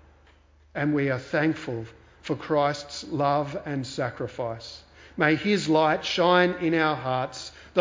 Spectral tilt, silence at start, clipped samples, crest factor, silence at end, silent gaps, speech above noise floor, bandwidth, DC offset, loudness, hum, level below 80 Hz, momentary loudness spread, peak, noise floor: -5.5 dB/octave; 0.75 s; under 0.1%; 20 dB; 0 s; none; 32 dB; 7.6 kHz; under 0.1%; -25 LUFS; none; -58 dBFS; 17 LU; -6 dBFS; -57 dBFS